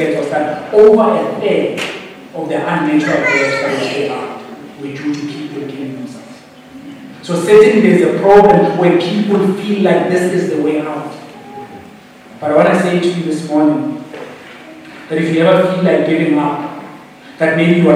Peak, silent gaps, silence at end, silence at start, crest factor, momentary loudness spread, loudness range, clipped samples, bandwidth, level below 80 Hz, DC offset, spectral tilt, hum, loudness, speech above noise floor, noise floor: 0 dBFS; none; 0 s; 0 s; 14 dB; 23 LU; 7 LU; 0.6%; 12.5 kHz; -52 dBFS; under 0.1%; -6.5 dB/octave; none; -13 LUFS; 26 dB; -37 dBFS